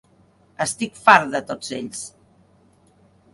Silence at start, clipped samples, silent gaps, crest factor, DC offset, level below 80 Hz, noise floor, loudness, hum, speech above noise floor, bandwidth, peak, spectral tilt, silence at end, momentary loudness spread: 0.6 s; under 0.1%; none; 24 dB; under 0.1%; -64 dBFS; -57 dBFS; -20 LUFS; none; 37 dB; 11.5 kHz; 0 dBFS; -3 dB/octave; 1.25 s; 18 LU